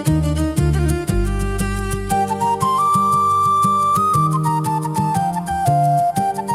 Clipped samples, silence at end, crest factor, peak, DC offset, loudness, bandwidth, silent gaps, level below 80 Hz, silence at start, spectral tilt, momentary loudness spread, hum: under 0.1%; 0 s; 12 dB; -4 dBFS; under 0.1%; -18 LUFS; 15.5 kHz; none; -28 dBFS; 0 s; -6.5 dB/octave; 6 LU; none